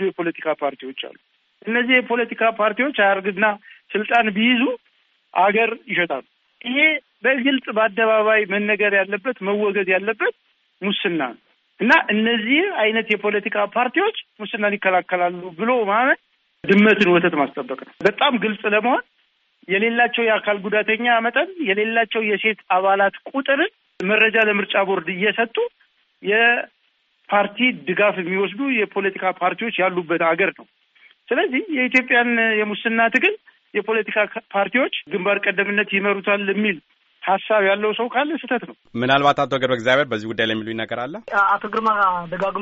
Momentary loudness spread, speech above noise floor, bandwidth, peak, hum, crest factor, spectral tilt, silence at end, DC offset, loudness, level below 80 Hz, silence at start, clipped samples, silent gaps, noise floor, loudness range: 9 LU; 45 dB; 7.6 kHz; -2 dBFS; none; 18 dB; -2 dB/octave; 0 s; under 0.1%; -19 LUFS; -68 dBFS; 0 s; under 0.1%; none; -64 dBFS; 2 LU